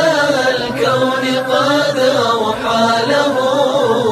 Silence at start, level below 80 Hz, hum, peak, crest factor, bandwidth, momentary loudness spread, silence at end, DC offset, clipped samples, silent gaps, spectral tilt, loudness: 0 s; -52 dBFS; none; -2 dBFS; 12 dB; 14 kHz; 3 LU; 0 s; under 0.1%; under 0.1%; none; -4 dB/octave; -14 LUFS